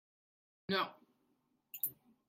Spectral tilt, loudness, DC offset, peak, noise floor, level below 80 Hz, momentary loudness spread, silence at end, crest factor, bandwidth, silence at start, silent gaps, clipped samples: -3.5 dB/octave; -39 LUFS; under 0.1%; -22 dBFS; -79 dBFS; -84 dBFS; 15 LU; 0.35 s; 24 dB; 16.5 kHz; 0.7 s; none; under 0.1%